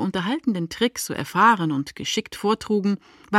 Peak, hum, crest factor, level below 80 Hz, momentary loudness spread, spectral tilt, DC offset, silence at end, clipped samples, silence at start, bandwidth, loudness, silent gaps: -4 dBFS; none; 18 dB; -58 dBFS; 9 LU; -4.5 dB/octave; under 0.1%; 0 s; under 0.1%; 0 s; 15.5 kHz; -23 LUFS; none